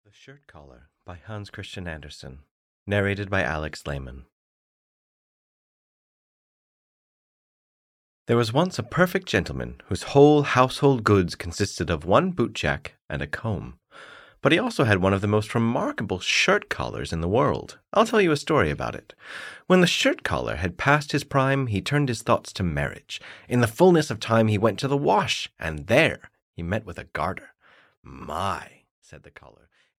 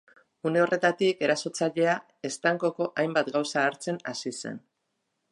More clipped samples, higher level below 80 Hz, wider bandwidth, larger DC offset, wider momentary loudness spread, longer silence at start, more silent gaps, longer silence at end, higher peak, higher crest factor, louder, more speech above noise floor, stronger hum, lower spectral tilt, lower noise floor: neither; first, -48 dBFS vs -80 dBFS; first, 16 kHz vs 11.5 kHz; neither; first, 17 LU vs 10 LU; second, 0.3 s vs 0.45 s; first, 2.51-2.86 s, 4.32-8.26 s, 26.42-26.53 s, 27.97-28.03 s, 28.91-29.02 s vs none; about the same, 0.8 s vs 0.75 s; first, -4 dBFS vs -10 dBFS; about the same, 22 dB vs 18 dB; first, -23 LUFS vs -27 LUFS; second, 24 dB vs 52 dB; neither; about the same, -5.5 dB/octave vs -4.5 dB/octave; second, -47 dBFS vs -79 dBFS